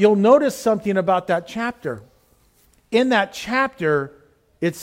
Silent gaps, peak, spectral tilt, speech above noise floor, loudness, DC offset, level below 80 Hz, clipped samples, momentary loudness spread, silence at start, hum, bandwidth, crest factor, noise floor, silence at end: none; -4 dBFS; -5.5 dB/octave; 39 dB; -20 LUFS; under 0.1%; -58 dBFS; under 0.1%; 13 LU; 0 s; none; 16.5 kHz; 16 dB; -58 dBFS; 0 s